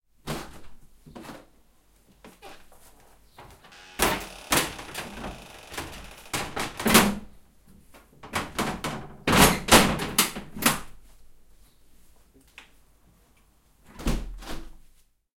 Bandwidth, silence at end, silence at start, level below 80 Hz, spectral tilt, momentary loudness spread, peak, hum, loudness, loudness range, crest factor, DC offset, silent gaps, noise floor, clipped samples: 16.5 kHz; 0.6 s; 0.25 s; -42 dBFS; -3 dB/octave; 24 LU; 0 dBFS; none; -24 LUFS; 17 LU; 28 dB; under 0.1%; none; -61 dBFS; under 0.1%